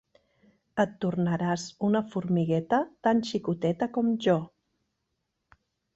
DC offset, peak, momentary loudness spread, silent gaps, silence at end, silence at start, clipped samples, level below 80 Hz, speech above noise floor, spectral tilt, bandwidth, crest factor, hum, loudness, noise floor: under 0.1%; -10 dBFS; 4 LU; none; 1.5 s; 0.75 s; under 0.1%; -66 dBFS; 53 dB; -7 dB/octave; 8 kHz; 18 dB; none; -28 LUFS; -80 dBFS